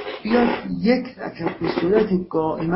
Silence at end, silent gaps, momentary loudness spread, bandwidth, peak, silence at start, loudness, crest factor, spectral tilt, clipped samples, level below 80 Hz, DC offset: 0 s; none; 8 LU; 5.8 kHz; -4 dBFS; 0 s; -21 LUFS; 16 dB; -11 dB/octave; under 0.1%; -50 dBFS; under 0.1%